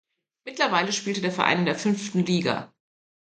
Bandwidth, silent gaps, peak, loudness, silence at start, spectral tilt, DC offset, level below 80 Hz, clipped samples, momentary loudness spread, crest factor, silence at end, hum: 9.2 kHz; none; -4 dBFS; -24 LUFS; 0.45 s; -4.5 dB/octave; under 0.1%; -68 dBFS; under 0.1%; 8 LU; 22 dB; 0.55 s; none